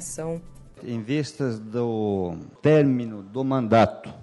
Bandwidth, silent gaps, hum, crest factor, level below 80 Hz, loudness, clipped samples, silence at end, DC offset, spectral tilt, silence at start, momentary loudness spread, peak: 11.5 kHz; none; none; 18 dB; -54 dBFS; -24 LUFS; under 0.1%; 0 s; under 0.1%; -6.5 dB/octave; 0 s; 14 LU; -6 dBFS